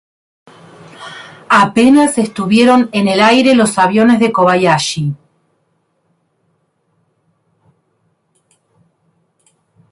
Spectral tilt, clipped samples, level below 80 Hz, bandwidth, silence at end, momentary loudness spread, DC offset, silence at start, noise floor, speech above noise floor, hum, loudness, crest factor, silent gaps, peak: -5 dB/octave; under 0.1%; -54 dBFS; 11.5 kHz; 4.75 s; 22 LU; under 0.1%; 1 s; -62 dBFS; 52 dB; none; -11 LUFS; 14 dB; none; 0 dBFS